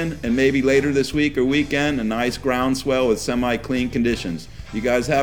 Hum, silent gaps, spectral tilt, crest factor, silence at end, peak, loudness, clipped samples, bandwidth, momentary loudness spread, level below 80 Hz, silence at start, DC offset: none; none; -5 dB/octave; 14 dB; 0 s; -6 dBFS; -20 LUFS; under 0.1%; 18 kHz; 6 LU; -40 dBFS; 0 s; 0.7%